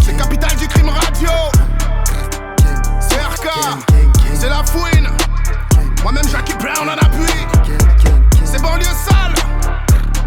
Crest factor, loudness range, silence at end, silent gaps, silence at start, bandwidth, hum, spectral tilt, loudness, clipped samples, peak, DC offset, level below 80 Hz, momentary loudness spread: 10 dB; 2 LU; 0 s; none; 0 s; 17.5 kHz; none; -4.5 dB/octave; -14 LUFS; under 0.1%; -2 dBFS; under 0.1%; -12 dBFS; 7 LU